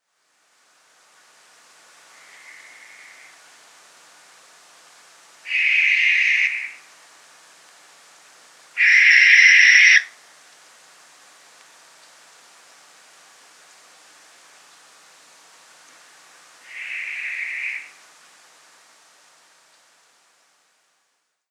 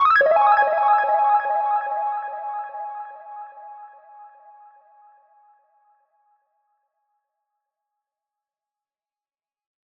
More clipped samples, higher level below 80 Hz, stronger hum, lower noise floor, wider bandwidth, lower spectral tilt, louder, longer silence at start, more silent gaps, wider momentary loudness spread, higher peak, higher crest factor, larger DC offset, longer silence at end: neither; second, under -90 dBFS vs -70 dBFS; neither; second, -72 dBFS vs under -90 dBFS; first, 13 kHz vs 5.4 kHz; second, 5 dB/octave vs -3 dB/octave; first, -14 LUFS vs -20 LUFS; first, 5.45 s vs 0 s; neither; about the same, 24 LU vs 23 LU; first, 0 dBFS vs -6 dBFS; first, 24 dB vs 18 dB; neither; second, 3.65 s vs 5.65 s